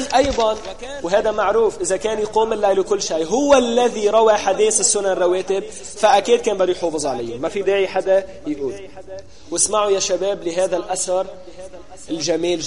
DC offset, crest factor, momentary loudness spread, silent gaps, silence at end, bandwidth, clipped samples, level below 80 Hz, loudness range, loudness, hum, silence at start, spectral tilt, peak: 1%; 16 dB; 15 LU; none; 0 s; 11.5 kHz; under 0.1%; -46 dBFS; 5 LU; -18 LUFS; none; 0 s; -2.5 dB/octave; -2 dBFS